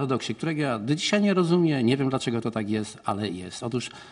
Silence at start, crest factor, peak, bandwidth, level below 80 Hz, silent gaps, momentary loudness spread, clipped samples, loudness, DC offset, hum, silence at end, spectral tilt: 0 s; 16 dB; -10 dBFS; 11 kHz; -64 dBFS; none; 9 LU; under 0.1%; -26 LUFS; under 0.1%; none; 0 s; -5.5 dB/octave